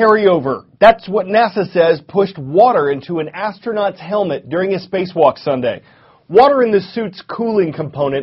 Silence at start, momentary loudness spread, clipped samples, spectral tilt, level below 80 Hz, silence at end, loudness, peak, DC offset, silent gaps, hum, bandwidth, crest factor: 0 s; 11 LU; under 0.1%; -4.5 dB/octave; -52 dBFS; 0 s; -15 LUFS; 0 dBFS; under 0.1%; none; none; 5.8 kHz; 14 dB